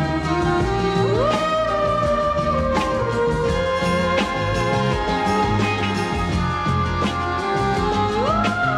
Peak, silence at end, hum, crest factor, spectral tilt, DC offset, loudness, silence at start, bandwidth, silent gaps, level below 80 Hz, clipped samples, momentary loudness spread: -6 dBFS; 0 s; none; 14 dB; -6 dB/octave; under 0.1%; -20 LUFS; 0 s; 13.5 kHz; none; -34 dBFS; under 0.1%; 3 LU